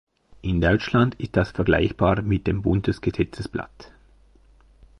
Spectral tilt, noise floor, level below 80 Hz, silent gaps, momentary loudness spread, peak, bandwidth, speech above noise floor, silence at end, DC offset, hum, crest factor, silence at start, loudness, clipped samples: -8 dB/octave; -54 dBFS; -38 dBFS; none; 12 LU; -6 dBFS; 11 kHz; 32 dB; 1.15 s; under 0.1%; none; 18 dB; 0.45 s; -23 LUFS; under 0.1%